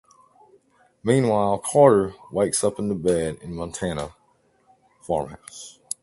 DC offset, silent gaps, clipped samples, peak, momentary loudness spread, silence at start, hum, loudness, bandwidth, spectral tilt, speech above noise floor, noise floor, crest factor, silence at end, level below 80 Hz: under 0.1%; none; under 0.1%; -2 dBFS; 19 LU; 1.05 s; none; -22 LUFS; 12 kHz; -5.5 dB/octave; 41 dB; -63 dBFS; 22 dB; 0.35 s; -50 dBFS